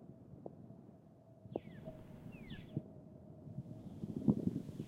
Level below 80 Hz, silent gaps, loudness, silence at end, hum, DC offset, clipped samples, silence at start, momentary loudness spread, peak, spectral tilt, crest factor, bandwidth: -66 dBFS; none; -44 LUFS; 0 s; none; under 0.1%; under 0.1%; 0 s; 21 LU; -18 dBFS; -9.5 dB/octave; 26 dB; 13 kHz